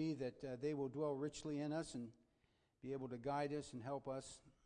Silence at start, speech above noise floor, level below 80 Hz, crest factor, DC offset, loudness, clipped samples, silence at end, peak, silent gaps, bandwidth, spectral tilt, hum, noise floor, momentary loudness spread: 0 s; 35 dB; -74 dBFS; 16 dB; under 0.1%; -46 LUFS; under 0.1%; 0.15 s; -30 dBFS; none; 10 kHz; -6 dB/octave; none; -80 dBFS; 8 LU